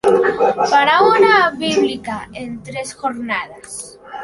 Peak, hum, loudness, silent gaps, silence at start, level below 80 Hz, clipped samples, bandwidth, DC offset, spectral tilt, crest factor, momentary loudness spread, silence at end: -2 dBFS; none; -15 LUFS; none; 0.05 s; -52 dBFS; under 0.1%; 11.5 kHz; under 0.1%; -3.5 dB/octave; 14 dB; 18 LU; 0 s